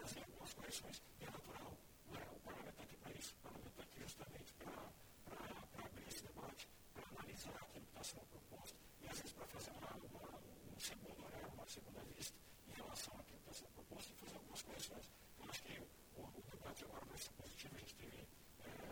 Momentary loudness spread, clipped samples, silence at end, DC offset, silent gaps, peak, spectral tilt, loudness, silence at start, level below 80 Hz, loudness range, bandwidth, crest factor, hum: 8 LU; under 0.1%; 0 s; under 0.1%; none; -36 dBFS; -3 dB/octave; -55 LUFS; 0 s; -70 dBFS; 2 LU; over 20 kHz; 22 dB; none